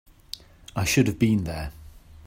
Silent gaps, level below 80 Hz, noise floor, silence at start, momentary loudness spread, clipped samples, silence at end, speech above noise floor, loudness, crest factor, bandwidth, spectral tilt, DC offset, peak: none; -44 dBFS; -44 dBFS; 0.75 s; 19 LU; under 0.1%; 0.3 s; 21 dB; -24 LUFS; 18 dB; 16 kHz; -5 dB/octave; under 0.1%; -8 dBFS